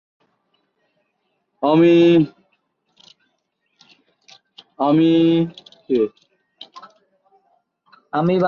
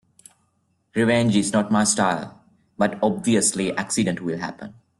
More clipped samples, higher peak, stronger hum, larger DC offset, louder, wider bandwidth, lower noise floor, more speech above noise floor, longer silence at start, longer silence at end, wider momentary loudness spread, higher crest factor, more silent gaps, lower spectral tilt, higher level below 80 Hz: neither; about the same, -4 dBFS vs -6 dBFS; neither; neither; first, -17 LUFS vs -21 LUFS; second, 6.8 kHz vs 12.5 kHz; about the same, -71 dBFS vs -68 dBFS; first, 56 dB vs 47 dB; first, 1.6 s vs 0.95 s; second, 0 s vs 0.3 s; first, 14 LU vs 11 LU; about the same, 16 dB vs 18 dB; neither; first, -8.5 dB/octave vs -4 dB/octave; second, -64 dBFS vs -58 dBFS